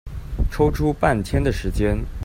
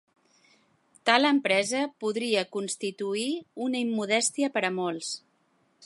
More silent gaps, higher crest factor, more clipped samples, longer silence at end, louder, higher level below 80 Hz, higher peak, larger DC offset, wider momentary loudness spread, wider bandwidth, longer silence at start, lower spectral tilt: neither; second, 18 dB vs 24 dB; neither; about the same, 0 s vs 0 s; first, -22 LUFS vs -27 LUFS; first, -26 dBFS vs -82 dBFS; about the same, -4 dBFS vs -4 dBFS; neither; second, 7 LU vs 10 LU; first, 16 kHz vs 11.5 kHz; second, 0.05 s vs 1.05 s; first, -7 dB/octave vs -2.5 dB/octave